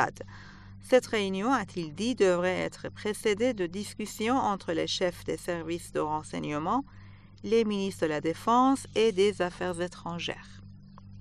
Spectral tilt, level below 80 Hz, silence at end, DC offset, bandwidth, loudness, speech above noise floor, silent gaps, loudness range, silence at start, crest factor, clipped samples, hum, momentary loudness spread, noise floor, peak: -5 dB/octave; -56 dBFS; 0 s; under 0.1%; 13 kHz; -29 LUFS; 20 dB; none; 3 LU; 0 s; 20 dB; under 0.1%; none; 11 LU; -48 dBFS; -8 dBFS